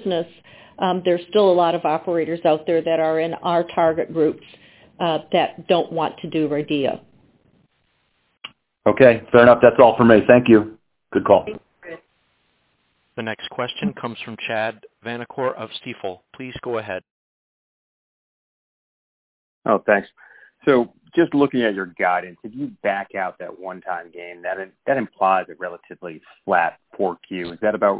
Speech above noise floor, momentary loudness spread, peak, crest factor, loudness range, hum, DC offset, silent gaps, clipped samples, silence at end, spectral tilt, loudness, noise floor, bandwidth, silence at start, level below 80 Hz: 48 dB; 21 LU; 0 dBFS; 20 dB; 15 LU; none; under 0.1%; 17.11-19.62 s; under 0.1%; 0 s; -10 dB/octave; -19 LUFS; -67 dBFS; 4 kHz; 0 s; -56 dBFS